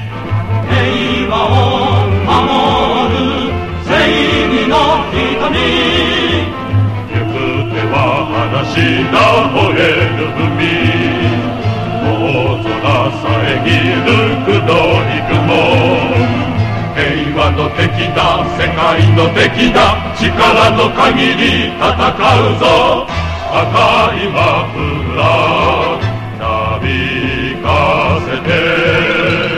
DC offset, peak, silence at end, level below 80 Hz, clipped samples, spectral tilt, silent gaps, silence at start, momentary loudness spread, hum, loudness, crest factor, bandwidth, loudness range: under 0.1%; 0 dBFS; 0 s; -28 dBFS; under 0.1%; -6 dB/octave; none; 0 s; 6 LU; none; -12 LUFS; 12 dB; 11.5 kHz; 3 LU